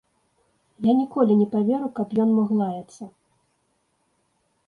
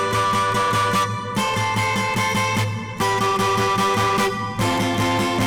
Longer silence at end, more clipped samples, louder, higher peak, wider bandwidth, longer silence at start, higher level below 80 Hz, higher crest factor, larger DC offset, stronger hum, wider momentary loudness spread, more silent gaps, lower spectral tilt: first, 1.6 s vs 0 s; neither; about the same, -22 LUFS vs -20 LUFS; first, -8 dBFS vs -16 dBFS; second, 6.8 kHz vs over 20 kHz; first, 0.8 s vs 0 s; second, -70 dBFS vs -48 dBFS; first, 16 dB vs 4 dB; neither; neither; first, 19 LU vs 4 LU; neither; first, -9 dB/octave vs -4 dB/octave